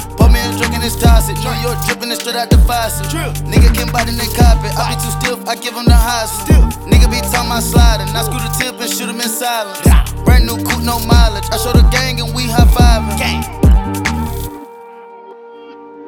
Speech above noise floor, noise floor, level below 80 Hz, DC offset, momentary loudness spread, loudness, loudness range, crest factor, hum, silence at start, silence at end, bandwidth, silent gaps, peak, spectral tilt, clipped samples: 23 dB; -34 dBFS; -14 dBFS; 0.3%; 7 LU; -13 LUFS; 2 LU; 12 dB; none; 0 s; 0 s; 18 kHz; none; 0 dBFS; -5 dB/octave; under 0.1%